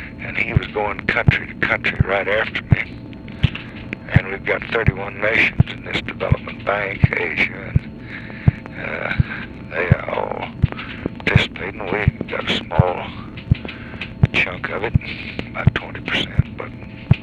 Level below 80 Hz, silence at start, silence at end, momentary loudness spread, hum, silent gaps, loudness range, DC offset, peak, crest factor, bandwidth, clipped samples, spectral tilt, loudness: -32 dBFS; 0 s; 0 s; 12 LU; none; none; 2 LU; under 0.1%; 0 dBFS; 20 dB; 8 kHz; under 0.1%; -7.5 dB/octave; -20 LUFS